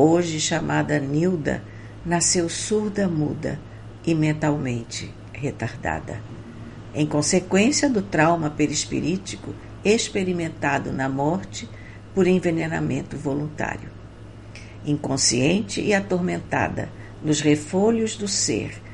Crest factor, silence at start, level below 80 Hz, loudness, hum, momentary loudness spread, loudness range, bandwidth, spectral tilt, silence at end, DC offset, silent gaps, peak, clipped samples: 18 dB; 0 s; -46 dBFS; -23 LUFS; none; 16 LU; 4 LU; 11.5 kHz; -4.5 dB/octave; 0 s; under 0.1%; none; -4 dBFS; under 0.1%